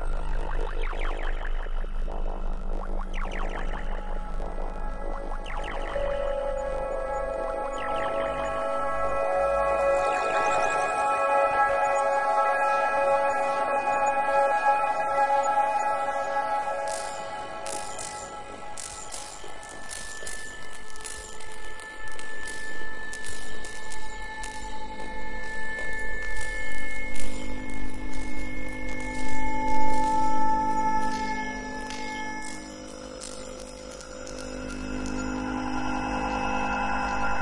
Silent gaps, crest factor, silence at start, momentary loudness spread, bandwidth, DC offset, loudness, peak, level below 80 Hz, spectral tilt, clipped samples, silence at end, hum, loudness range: none; 16 dB; 0 s; 14 LU; 11.5 kHz; under 0.1%; -29 LUFS; -8 dBFS; -36 dBFS; -4 dB/octave; under 0.1%; 0 s; none; 13 LU